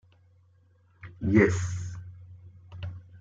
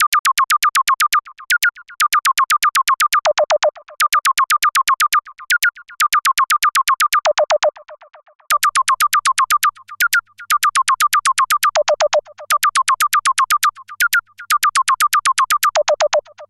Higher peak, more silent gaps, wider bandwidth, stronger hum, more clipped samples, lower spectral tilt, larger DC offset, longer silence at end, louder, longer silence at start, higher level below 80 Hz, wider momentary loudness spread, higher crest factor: second, -8 dBFS vs -4 dBFS; second, none vs 0.07-0.12 s, 0.19-0.24 s, 8.35-8.39 s; second, 7.8 kHz vs 17.5 kHz; neither; neither; first, -7 dB/octave vs 3.5 dB/octave; neither; about the same, 0 s vs 0.05 s; second, -26 LUFS vs -15 LUFS; first, 1.05 s vs 0 s; first, -56 dBFS vs -62 dBFS; first, 27 LU vs 5 LU; first, 24 dB vs 12 dB